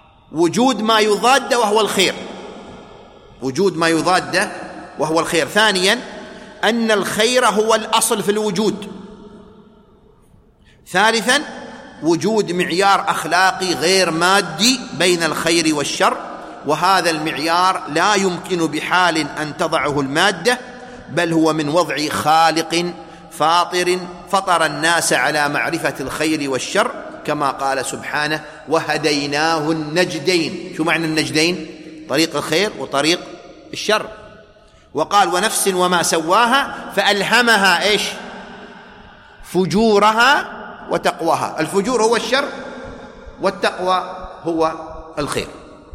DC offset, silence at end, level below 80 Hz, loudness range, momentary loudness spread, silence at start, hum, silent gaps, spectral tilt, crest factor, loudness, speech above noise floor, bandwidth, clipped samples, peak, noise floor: under 0.1%; 0.05 s; -50 dBFS; 5 LU; 16 LU; 0.3 s; none; none; -3 dB/octave; 18 dB; -17 LUFS; 33 dB; 16 kHz; under 0.1%; 0 dBFS; -50 dBFS